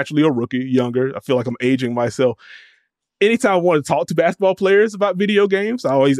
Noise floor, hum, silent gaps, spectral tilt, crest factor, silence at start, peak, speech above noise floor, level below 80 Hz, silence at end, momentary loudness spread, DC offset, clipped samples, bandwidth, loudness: -62 dBFS; none; none; -6 dB/octave; 14 dB; 0 s; -4 dBFS; 45 dB; -64 dBFS; 0 s; 6 LU; under 0.1%; under 0.1%; 13 kHz; -17 LUFS